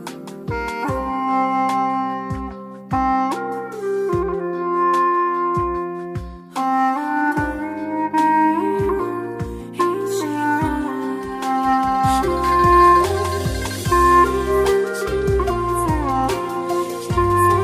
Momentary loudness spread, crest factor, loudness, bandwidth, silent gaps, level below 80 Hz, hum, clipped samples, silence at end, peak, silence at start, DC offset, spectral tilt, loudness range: 11 LU; 16 dB; -19 LUFS; 15.5 kHz; none; -34 dBFS; none; under 0.1%; 0 s; -2 dBFS; 0 s; under 0.1%; -6 dB/octave; 6 LU